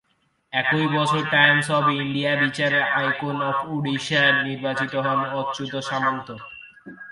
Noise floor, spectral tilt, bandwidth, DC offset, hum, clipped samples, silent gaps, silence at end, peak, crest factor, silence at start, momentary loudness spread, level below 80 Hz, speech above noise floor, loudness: -68 dBFS; -5 dB/octave; 11.5 kHz; under 0.1%; none; under 0.1%; none; 0 s; -2 dBFS; 20 dB; 0.5 s; 11 LU; -64 dBFS; 46 dB; -21 LUFS